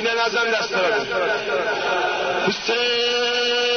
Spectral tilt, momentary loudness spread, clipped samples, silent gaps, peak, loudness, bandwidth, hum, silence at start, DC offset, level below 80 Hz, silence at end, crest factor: -2 dB/octave; 3 LU; under 0.1%; none; -8 dBFS; -20 LUFS; 6.6 kHz; none; 0 s; under 0.1%; -56 dBFS; 0 s; 12 dB